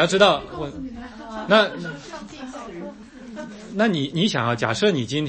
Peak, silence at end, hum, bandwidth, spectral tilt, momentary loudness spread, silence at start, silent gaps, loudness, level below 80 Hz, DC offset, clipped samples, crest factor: -2 dBFS; 0 s; none; 8.8 kHz; -5 dB/octave; 19 LU; 0 s; none; -21 LUFS; -52 dBFS; under 0.1%; under 0.1%; 22 dB